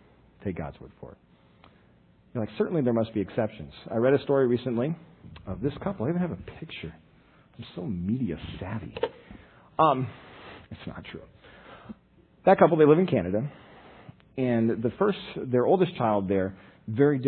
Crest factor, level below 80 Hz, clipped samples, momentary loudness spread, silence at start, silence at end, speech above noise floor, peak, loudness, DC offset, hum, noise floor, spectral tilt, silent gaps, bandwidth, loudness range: 24 dB; -56 dBFS; under 0.1%; 22 LU; 0.4 s; 0 s; 33 dB; -4 dBFS; -26 LUFS; under 0.1%; none; -59 dBFS; -11.5 dB/octave; none; 4.5 kHz; 9 LU